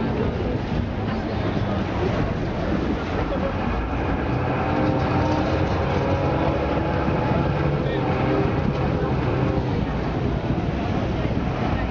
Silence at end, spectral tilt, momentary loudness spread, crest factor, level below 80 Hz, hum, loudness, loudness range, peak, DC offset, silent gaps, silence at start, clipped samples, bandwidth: 0 s; -8 dB/octave; 4 LU; 14 dB; -32 dBFS; none; -23 LUFS; 2 LU; -8 dBFS; under 0.1%; none; 0 s; under 0.1%; 7 kHz